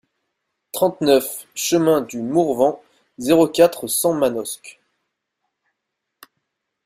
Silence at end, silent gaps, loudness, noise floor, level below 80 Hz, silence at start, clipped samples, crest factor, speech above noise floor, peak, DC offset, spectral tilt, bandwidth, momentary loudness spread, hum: 2.15 s; none; -18 LUFS; -79 dBFS; -62 dBFS; 0.75 s; under 0.1%; 18 dB; 61 dB; -2 dBFS; under 0.1%; -4.5 dB/octave; 16 kHz; 12 LU; none